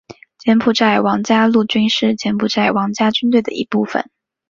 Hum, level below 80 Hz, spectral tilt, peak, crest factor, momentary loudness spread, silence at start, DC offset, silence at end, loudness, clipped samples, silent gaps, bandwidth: none; -56 dBFS; -5 dB/octave; 0 dBFS; 14 dB; 7 LU; 0.1 s; under 0.1%; 0.45 s; -15 LUFS; under 0.1%; none; 7.4 kHz